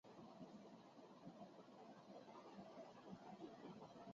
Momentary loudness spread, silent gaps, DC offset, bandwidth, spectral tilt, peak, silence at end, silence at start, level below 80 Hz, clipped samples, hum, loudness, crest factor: 5 LU; none; under 0.1%; 7.4 kHz; -5.5 dB/octave; -44 dBFS; 0 s; 0.05 s; under -90 dBFS; under 0.1%; none; -61 LUFS; 16 dB